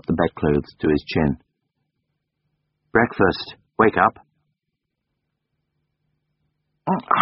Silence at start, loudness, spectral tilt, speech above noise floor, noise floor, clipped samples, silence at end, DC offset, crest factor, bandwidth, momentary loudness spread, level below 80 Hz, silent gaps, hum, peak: 0.1 s; -21 LUFS; -5 dB/octave; 60 dB; -79 dBFS; under 0.1%; 0 s; under 0.1%; 22 dB; 5.8 kHz; 12 LU; -44 dBFS; none; none; -2 dBFS